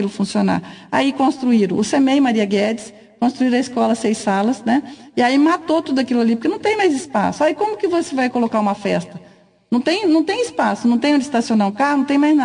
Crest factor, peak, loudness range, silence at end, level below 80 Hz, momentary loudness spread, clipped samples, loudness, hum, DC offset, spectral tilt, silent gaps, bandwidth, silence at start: 12 dB; -4 dBFS; 2 LU; 0 s; -62 dBFS; 6 LU; under 0.1%; -18 LUFS; none; under 0.1%; -5.5 dB/octave; none; 10.5 kHz; 0 s